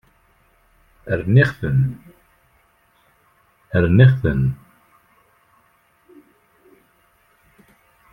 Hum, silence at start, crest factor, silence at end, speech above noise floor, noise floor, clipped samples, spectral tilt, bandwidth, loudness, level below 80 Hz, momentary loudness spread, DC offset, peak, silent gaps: none; 1.05 s; 20 dB; 3.6 s; 44 dB; -59 dBFS; under 0.1%; -9 dB/octave; 5.2 kHz; -17 LUFS; -44 dBFS; 19 LU; under 0.1%; -2 dBFS; none